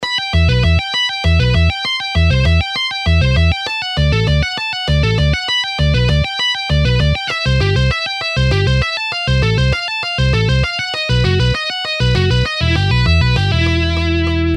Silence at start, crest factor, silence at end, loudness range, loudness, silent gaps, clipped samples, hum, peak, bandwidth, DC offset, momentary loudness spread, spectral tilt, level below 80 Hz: 0 s; 12 dB; 0 s; 1 LU; -15 LUFS; none; under 0.1%; none; -2 dBFS; 10.5 kHz; under 0.1%; 4 LU; -5.5 dB/octave; -20 dBFS